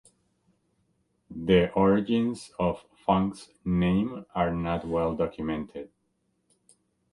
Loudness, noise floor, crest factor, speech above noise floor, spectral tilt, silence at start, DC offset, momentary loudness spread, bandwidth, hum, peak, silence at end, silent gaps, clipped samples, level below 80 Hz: -27 LUFS; -74 dBFS; 20 dB; 48 dB; -7.5 dB/octave; 1.3 s; under 0.1%; 13 LU; 11.5 kHz; none; -8 dBFS; 1.25 s; none; under 0.1%; -48 dBFS